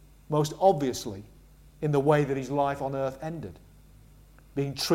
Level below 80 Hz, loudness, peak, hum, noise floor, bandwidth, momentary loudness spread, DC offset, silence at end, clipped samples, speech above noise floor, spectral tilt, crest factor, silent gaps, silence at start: -54 dBFS; -28 LUFS; -8 dBFS; none; -54 dBFS; 16 kHz; 15 LU; under 0.1%; 0 s; under 0.1%; 27 dB; -6 dB/octave; 20 dB; none; 0.3 s